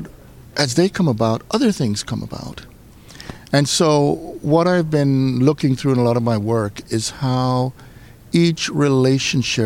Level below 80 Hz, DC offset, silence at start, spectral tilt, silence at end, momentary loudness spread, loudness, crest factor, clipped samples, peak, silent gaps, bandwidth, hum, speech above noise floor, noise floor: -46 dBFS; under 0.1%; 0 s; -5.5 dB/octave; 0 s; 12 LU; -18 LUFS; 16 dB; under 0.1%; -2 dBFS; none; 16 kHz; none; 25 dB; -42 dBFS